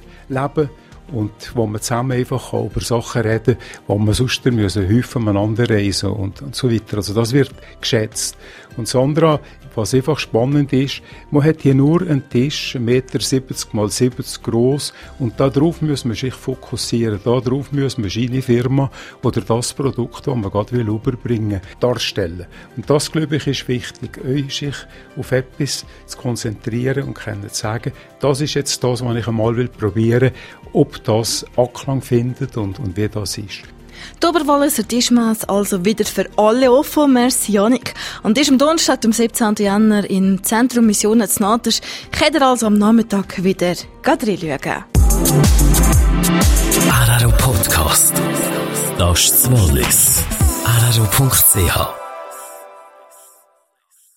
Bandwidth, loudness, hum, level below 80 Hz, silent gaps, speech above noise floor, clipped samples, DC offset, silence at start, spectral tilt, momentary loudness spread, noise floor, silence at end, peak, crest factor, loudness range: 16.5 kHz; -16 LUFS; none; -28 dBFS; none; 43 dB; under 0.1%; under 0.1%; 0.1 s; -4.5 dB/octave; 11 LU; -60 dBFS; 1.35 s; 0 dBFS; 16 dB; 8 LU